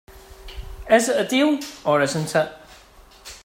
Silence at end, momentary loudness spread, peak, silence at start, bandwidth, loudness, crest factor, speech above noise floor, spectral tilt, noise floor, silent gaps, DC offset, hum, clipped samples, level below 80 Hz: 0.05 s; 21 LU; -4 dBFS; 0.1 s; 16 kHz; -20 LUFS; 20 dB; 29 dB; -4 dB/octave; -48 dBFS; none; under 0.1%; none; under 0.1%; -44 dBFS